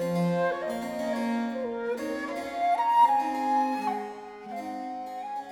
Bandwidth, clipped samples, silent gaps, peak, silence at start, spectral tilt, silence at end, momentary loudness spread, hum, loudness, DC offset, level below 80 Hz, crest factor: 18.5 kHz; under 0.1%; none; -12 dBFS; 0 s; -6.5 dB/octave; 0 s; 14 LU; none; -28 LUFS; under 0.1%; -68 dBFS; 16 dB